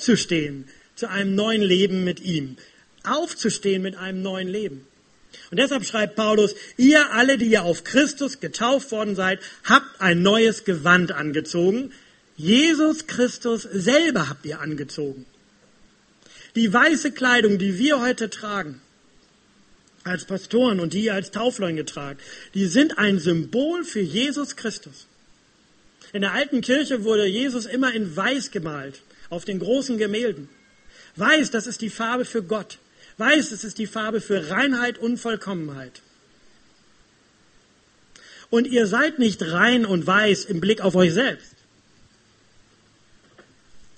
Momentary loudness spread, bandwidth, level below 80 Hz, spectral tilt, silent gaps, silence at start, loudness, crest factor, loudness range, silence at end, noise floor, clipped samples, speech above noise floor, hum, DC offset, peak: 13 LU; 8.8 kHz; -62 dBFS; -4.5 dB/octave; none; 0 s; -21 LUFS; 22 dB; 7 LU; 0.15 s; -58 dBFS; under 0.1%; 37 dB; none; under 0.1%; 0 dBFS